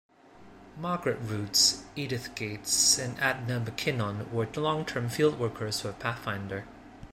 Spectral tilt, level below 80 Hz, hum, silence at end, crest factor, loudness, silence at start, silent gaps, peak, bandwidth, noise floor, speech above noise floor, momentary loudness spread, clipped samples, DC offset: -3 dB/octave; -58 dBFS; none; 0 s; 20 dB; -28 LUFS; 0.35 s; none; -10 dBFS; 16 kHz; -53 dBFS; 23 dB; 13 LU; under 0.1%; under 0.1%